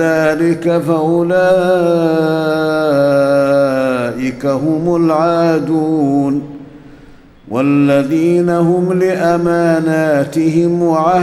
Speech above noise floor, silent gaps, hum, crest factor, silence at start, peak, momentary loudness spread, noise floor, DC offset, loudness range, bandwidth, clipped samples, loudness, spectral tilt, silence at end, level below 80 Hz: 27 dB; none; none; 12 dB; 0 s; -2 dBFS; 5 LU; -40 dBFS; under 0.1%; 2 LU; 14.5 kHz; under 0.1%; -13 LUFS; -7.5 dB/octave; 0 s; -50 dBFS